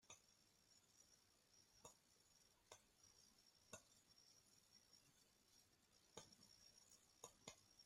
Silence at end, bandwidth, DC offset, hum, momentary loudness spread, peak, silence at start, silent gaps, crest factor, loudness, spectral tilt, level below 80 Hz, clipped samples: 0 s; 15.5 kHz; under 0.1%; none; 6 LU; -40 dBFS; 0 s; none; 32 dB; -66 LUFS; -1.5 dB/octave; under -90 dBFS; under 0.1%